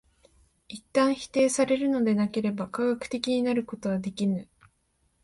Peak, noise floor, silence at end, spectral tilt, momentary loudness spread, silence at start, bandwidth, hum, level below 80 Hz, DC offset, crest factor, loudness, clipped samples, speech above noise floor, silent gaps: -10 dBFS; -71 dBFS; 0.8 s; -5 dB/octave; 6 LU; 0.7 s; 11.5 kHz; none; -64 dBFS; under 0.1%; 18 dB; -27 LUFS; under 0.1%; 45 dB; none